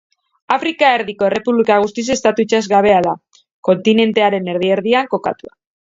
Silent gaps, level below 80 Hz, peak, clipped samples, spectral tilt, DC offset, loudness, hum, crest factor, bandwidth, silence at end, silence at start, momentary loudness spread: 3.51-3.63 s; -56 dBFS; 0 dBFS; under 0.1%; -4.5 dB/octave; under 0.1%; -15 LUFS; none; 16 dB; 7.8 kHz; 0.5 s; 0.5 s; 8 LU